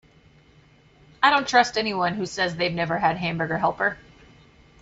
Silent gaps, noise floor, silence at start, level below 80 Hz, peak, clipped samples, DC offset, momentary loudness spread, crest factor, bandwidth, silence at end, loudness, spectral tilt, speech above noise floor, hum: none; -55 dBFS; 1.2 s; -56 dBFS; -4 dBFS; under 0.1%; under 0.1%; 7 LU; 22 dB; 8 kHz; 0.85 s; -23 LUFS; -4 dB/octave; 32 dB; none